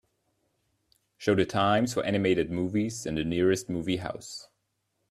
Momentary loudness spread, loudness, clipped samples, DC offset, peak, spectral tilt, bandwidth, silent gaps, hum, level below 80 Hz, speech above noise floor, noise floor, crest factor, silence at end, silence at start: 11 LU; -28 LUFS; under 0.1%; under 0.1%; -10 dBFS; -5.5 dB/octave; 14 kHz; none; none; -58 dBFS; 51 dB; -78 dBFS; 18 dB; 0.65 s; 1.2 s